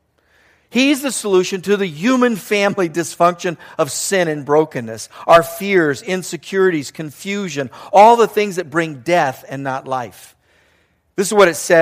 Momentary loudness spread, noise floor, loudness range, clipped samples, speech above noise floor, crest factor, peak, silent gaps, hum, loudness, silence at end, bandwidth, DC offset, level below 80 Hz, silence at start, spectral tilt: 12 LU; -59 dBFS; 2 LU; under 0.1%; 43 dB; 16 dB; 0 dBFS; none; none; -16 LUFS; 0 s; 15.5 kHz; under 0.1%; -58 dBFS; 0.75 s; -4 dB/octave